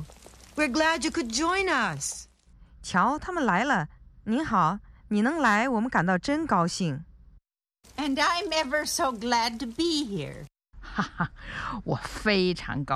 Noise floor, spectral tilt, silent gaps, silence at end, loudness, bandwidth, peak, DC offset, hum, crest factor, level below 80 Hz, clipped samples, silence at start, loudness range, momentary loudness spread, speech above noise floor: -63 dBFS; -4 dB/octave; none; 0 s; -26 LUFS; 14.5 kHz; -8 dBFS; under 0.1%; none; 20 dB; -50 dBFS; under 0.1%; 0 s; 4 LU; 12 LU; 37 dB